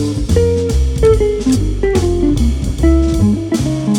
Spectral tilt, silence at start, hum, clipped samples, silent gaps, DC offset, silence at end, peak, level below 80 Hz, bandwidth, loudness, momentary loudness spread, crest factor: -7 dB/octave; 0 s; none; under 0.1%; none; under 0.1%; 0 s; 0 dBFS; -18 dBFS; 13.5 kHz; -14 LUFS; 4 LU; 12 dB